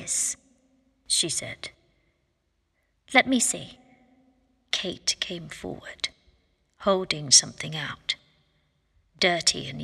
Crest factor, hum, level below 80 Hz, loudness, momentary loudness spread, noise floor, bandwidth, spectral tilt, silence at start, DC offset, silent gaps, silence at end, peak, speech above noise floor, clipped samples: 24 dB; none; -62 dBFS; -24 LUFS; 20 LU; -73 dBFS; 14.5 kHz; -1.5 dB/octave; 0 s; under 0.1%; none; 0 s; -4 dBFS; 47 dB; under 0.1%